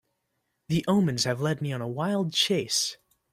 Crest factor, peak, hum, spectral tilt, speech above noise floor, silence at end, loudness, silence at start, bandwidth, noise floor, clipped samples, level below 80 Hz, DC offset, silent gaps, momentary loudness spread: 20 dB; -8 dBFS; none; -4.5 dB/octave; 52 dB; 0.4 s; -26 LUFS; 0.7 s; 16 kHz; -78 dBFS; under 0.1%; -62 dBFS; under 0.1%; none; 7 LU